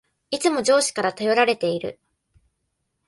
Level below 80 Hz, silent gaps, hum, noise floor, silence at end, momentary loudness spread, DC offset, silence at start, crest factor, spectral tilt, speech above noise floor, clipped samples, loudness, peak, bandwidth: -66 dBFS; none; none; -75 dBFS; 1.15 s; 11 LU; under 0.1%; 0.3 s; 18 dB; -3 dB/octave; 54 dB; under 0.1%; -21 LUFS; -6 dBFS; 12 kHz